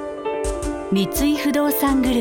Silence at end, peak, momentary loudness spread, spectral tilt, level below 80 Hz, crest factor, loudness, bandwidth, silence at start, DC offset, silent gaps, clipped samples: 0 s; -10 dBFS; 7 LU; -5 dB/octave; -34 dBFS; 10 dB; -21 LUFS; 19 kHz; 0 s; under 0.1%; none; under 0.1%